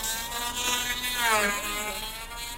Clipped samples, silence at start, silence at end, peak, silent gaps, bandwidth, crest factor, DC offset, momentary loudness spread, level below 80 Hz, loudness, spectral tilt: under 0.1%; 0 s; 0 s; -10 dBFS; none; 16 kHz; 20 dB; under 0.1%; 10 LU; -46 dBFS; -27 LUFS; -0.5 dB/octave